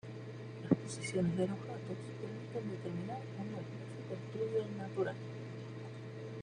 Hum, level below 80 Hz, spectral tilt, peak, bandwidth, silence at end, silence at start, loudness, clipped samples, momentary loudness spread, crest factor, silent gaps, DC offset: none; -72 dBFS; -7 dB/octave; -14 dBFS; 10.5 kHz; 0 s; 0.05 s; -41 LUFS; under 0.1%; 12 LU; 26 dB; none; under 0.1%